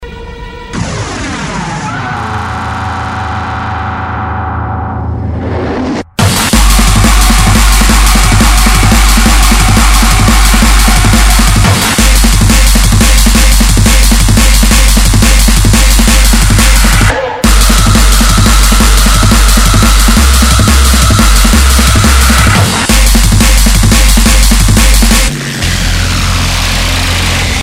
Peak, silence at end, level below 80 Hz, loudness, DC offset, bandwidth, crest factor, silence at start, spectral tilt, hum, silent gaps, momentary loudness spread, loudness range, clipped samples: 0 dBFS; 0 s; -8 dBFS; -7 LUFS; under 0.1%; 16.5 kHz; 6 dB; 0 s; -3.5 dB/octave; none; none; 10 LU; 9 LU; 4%